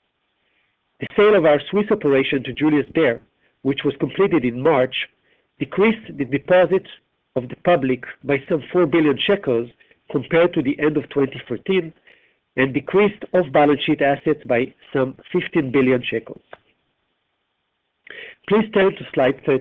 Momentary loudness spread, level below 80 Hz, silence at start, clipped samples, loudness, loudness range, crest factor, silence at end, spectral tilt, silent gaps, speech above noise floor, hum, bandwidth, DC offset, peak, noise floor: 12 LU; -56 dBFS; 1 s; under 0.1%; -19 LUFS; 5 LU; 16 dB; 0 s; -9 dB/octave; none; 54 dB; none; 4.2 kHz; under 0.1%; -4 dBFS; -73 dBFS